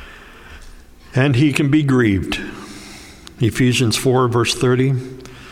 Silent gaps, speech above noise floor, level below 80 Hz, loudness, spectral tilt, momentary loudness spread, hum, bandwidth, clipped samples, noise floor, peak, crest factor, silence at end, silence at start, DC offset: none; 24 dB; -42 dBFS; -17 LUFS; -5.5 dB/octave; 20 LU; none; 16 kHz; under 0.1%; -40 dBFS; 0 dBFS; 18 dB; 0 s; 0 s; under 0.1%